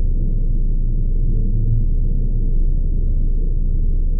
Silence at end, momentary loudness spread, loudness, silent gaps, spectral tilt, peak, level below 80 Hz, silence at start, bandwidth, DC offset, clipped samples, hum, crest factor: 0 s; 2 LU; -23 LUFS; none; -17 dB/octave; -6 dBFS; -16 dBFS; 0 s; 0.7 kHz; under 0.1%; under 0.1%; none; 8 dB